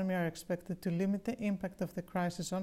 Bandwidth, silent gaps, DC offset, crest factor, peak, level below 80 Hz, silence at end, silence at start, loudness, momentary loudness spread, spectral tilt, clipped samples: 15 kHz; none; under 0.1%; 14 dB; -22 dBFS; -64 dBFS; 0 s; 0 s; -37 LUFS; 5 LU; -6.5 dB/octave; under 0.1%